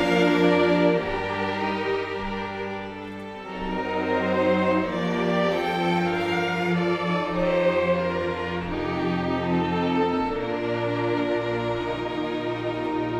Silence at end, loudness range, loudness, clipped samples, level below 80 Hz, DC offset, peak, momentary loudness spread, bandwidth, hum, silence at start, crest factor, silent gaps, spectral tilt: 0 s; 3 LU; -24 LUFS; under 0.1%; -48 dBFS; under 0.1%; -8 dBFS; 9 LU; 11.5 kHz; none; 0 s; 16 dB; none; -7 dB/octave